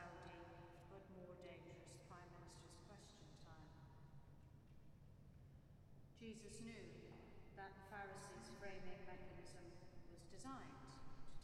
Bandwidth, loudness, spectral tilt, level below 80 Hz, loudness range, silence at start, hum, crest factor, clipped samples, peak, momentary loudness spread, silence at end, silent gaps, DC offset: 13 kHz; -60 LUFS; -5 dB/octave; -68 dBFS; 7 LU; 0 s; none; 18 dB; under 0.1%; -40 dBFS; 11 LU; 0 s; none; under 0.1%